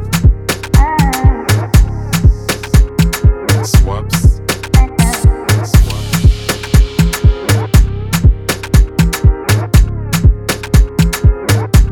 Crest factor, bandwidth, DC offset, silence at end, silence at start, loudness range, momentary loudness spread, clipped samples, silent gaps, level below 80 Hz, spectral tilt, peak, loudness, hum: 10 dB; 18 kHz; under 0.1%; 0 s; 0 s; 0 LU; 3 LU; 0.8%; none; -12 dBFS; -5.5 dB/octave; 0 dBFS; -12 LUFS; none